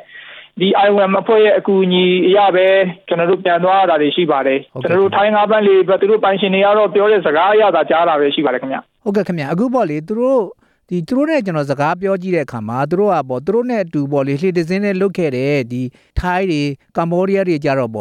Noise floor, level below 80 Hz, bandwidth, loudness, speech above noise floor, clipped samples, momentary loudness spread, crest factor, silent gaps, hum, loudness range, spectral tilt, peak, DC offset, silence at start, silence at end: -37 dBFS; -42 dBFS; 9.6 kHz; -15 LUFS; 23 dB; under 0.1%; 8 LU; 12 dB; none; none; 5 LU; -7 dB/octave; -2 dBFS; under 0.1%; 0.15 s; 0 s